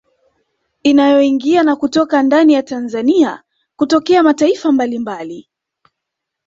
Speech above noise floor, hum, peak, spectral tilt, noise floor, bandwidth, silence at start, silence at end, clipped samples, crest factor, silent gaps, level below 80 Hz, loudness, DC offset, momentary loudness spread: 66 dB; none; -2 dBFS; -4.5 dB/octave; -79 dBFS; 8 kHz; 0.85 s; 1.05 s; under 0.1%; 12 dB; none; -58 dBFS; -13 LUFS; under 0.1%; 13 LU